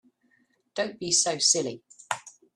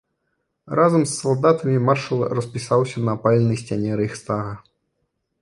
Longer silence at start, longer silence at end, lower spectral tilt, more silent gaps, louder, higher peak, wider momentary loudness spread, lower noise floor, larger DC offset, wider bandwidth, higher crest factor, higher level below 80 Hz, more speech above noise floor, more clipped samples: about the same, 0.75 s vs 0.65 s; second, 0.25 s vs 0.8 s; second, -1 dB/octave vs -6.5 dB/octave; neither; second, -25 LUFS vs -20 LUFS; second, -8 dBFS vs -2 dBFS; first, 15 LU vs 9 LU; second, -68 dBFS vs -74 dBFS; neither; first, 13 kHz vs 11.5 kHz; about the same, 22 dB vs 18 dB; second, -72 dBFS vs -56 dBFS; second, 42 dB vs 54 dB; neither